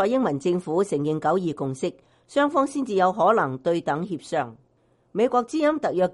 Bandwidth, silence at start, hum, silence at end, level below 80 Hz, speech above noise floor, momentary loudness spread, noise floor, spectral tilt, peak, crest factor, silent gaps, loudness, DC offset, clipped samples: 11.5 kHz; 0 s; none; 0 s; -64 dBFS; 41 dB; 8 LU; -64 dBFS; -6.5 dB/octave; -6 dBFS; 16 dB; none; -24 LUFS; under 0.1%; under 0.1%